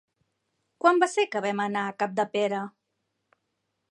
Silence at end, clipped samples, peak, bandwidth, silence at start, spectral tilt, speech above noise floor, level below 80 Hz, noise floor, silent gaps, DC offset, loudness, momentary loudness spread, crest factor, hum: 1.2 s; under 0.1%; -8 dBFS; 11 kHz; 0.85 s; -4.5 dB/octave; 54 dB; -82 dBFS; -79 dBFS; none; under 0.1%; -26 LUFS; 7 LU; 20 dB; none